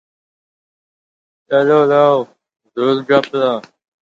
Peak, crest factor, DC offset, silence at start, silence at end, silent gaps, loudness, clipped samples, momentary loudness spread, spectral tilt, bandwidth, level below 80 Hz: 0 dBFS; 16 dB; under 0.1%; 1.5 s; 0.55 s; none; -14 LUFS; under 0.1%; 13 LU; -7 dB/octave; 7.6 kHz; -66 dBFS